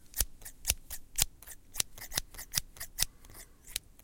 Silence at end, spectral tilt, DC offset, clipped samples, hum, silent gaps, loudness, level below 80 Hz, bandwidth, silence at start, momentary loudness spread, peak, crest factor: 0 s; 0 dB/octave; under 0.1%; under 0.1%; none; none; -35 LUFS; -46 dBFS; 17 kHz; 0 s; 16 LU; -4 dBFS; 34 dB